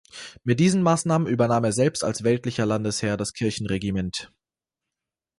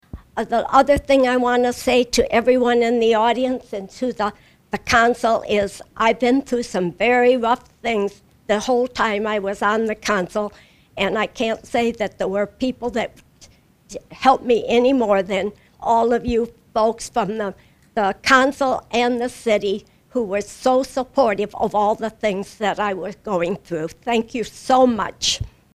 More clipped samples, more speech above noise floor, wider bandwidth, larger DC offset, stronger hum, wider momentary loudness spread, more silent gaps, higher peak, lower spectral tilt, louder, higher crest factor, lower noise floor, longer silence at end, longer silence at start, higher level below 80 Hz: neither; first, 65 dB vs 31 dB; second, 11.5 kHz vs 14.5 kHz; neither; neither; second, 8 LU vs 11 LU; neither; second, -8 dBFS vs 0 dBFS; first, -5.5 dB/octave vs -4 dB/octave; second, -23 LUFS vs -20 LUFS; about the same, 16 dB vs 20 dB; first, -88 dBFS vs -50 dBFS; first, 1.15 s vs 0.25 s; about the same, 0.15 s vs 0.15 s; second, -52 dBFS vs -46 dBFS